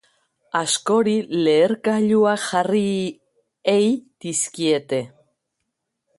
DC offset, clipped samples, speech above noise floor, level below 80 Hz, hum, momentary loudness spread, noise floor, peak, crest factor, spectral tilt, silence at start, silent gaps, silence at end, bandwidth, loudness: under 0.1%; under 0.1%; 58 dB; -68 dBFS; none; 9 LU; -78 dBFS; -6 dBFS; 16 dB; -4 dB/octave; 0.55 s; none; 1.1 s; 11.5 kHz; -20 LUFS